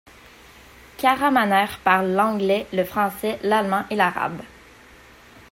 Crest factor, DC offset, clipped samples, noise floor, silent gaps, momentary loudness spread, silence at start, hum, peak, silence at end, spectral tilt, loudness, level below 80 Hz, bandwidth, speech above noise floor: 18 dB; under 0.1%; under 0.1%; -48 dBFS; none; 7 LU; 1 s; none; -4 dBFS; 1.05 s; -5 dB/octave; -21 LUFS; -56 dBFS; 16 kHz; 27 dB